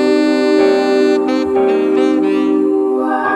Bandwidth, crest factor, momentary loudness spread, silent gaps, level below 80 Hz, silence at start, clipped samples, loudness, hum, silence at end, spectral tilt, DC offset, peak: 10 kHz; 12 dB; 3 LU; none; -56 dBFS; 0 s; under 0.1%; -13 LUFS; none; 0 s; -5 dB/octave; under 0.1%; 0 dBFS